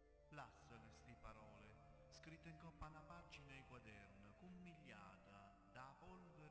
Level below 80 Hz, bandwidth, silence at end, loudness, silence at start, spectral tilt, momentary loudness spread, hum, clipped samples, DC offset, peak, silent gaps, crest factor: -72 dBFS; 8 kHz; 0 s; -63 LUFS; 0 s; -5.5 dB/octave; 5 LU; none; under 0.1%; under 0.1%; -48 dBFS; none; 14 dB